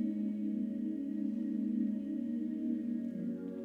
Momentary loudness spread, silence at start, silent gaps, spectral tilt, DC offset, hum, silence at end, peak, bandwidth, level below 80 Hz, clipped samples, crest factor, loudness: 3 LU; 0 s; none; -10 dB/octave; under 0.1%; none; 0 s; -24 dBFS; 3.5 kHz; -80 dBFS; under 0.1%; 12 dB; -37 LUFS